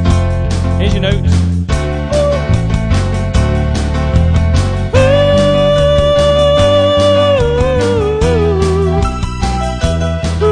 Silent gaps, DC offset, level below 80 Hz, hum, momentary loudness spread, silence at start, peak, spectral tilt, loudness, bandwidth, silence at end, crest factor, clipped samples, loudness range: none; under 0.1%; -18 dBFS; none; 6 LU; 0 s; 0 dBFS; -6.5 dB/octave; -12 LUFS; 10 kHz; 0 s; 10 dB; under 0.1%; 4 LU